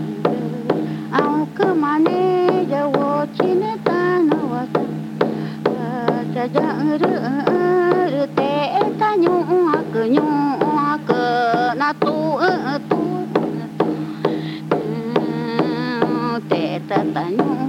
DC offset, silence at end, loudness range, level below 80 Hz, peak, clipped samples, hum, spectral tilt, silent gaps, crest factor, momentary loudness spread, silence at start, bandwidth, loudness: under 0.1%; 0 s; 4 LU; -66 dBFS; -2 dBFS; under 0.1%; none; -7.5 dB/octave; none; 16 dB; 5 LU; 0 s; 13.5 kHz; -19 LUFS